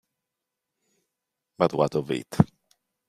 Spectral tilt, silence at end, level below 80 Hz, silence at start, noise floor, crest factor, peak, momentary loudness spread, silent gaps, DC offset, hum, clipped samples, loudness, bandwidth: -7.5 dB/octave; 0.65 s; -56 dBFS; 1.6 s; -85 dBFS; 26 dB; -2 dBFS; 5 LU; none; under 0.1%; none; under 0.1%; -25 LUFS; 14.5 kHz